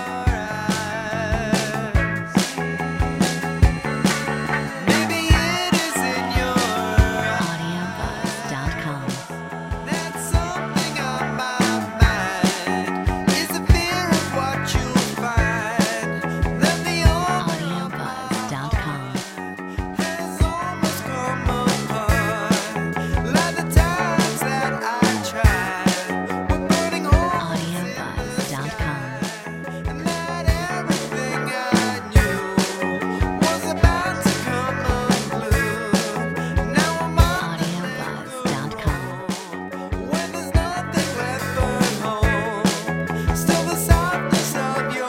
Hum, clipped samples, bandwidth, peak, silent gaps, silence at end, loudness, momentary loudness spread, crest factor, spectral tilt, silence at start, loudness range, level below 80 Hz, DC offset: none; under 0.1%; 16.5 kHz; -2 dBFS; none; 0 s; -22 LUFS; 8 LU; 20 dB; -5 dB/octave; 0 s; 5 LU; -28 dBFS; under 0.1%